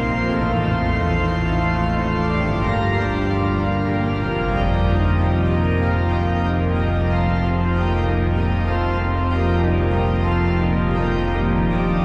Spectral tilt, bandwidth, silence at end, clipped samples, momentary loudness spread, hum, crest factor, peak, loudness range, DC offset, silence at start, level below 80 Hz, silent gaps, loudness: -8.5 dB/octave; 6.6 kHz; 0 s; under 0.1%; 2 LU; none; 12 dB; -6 dBFS; 1 LU; under 0.1%; 0 s; -26 dBFS; none; -20 LUFS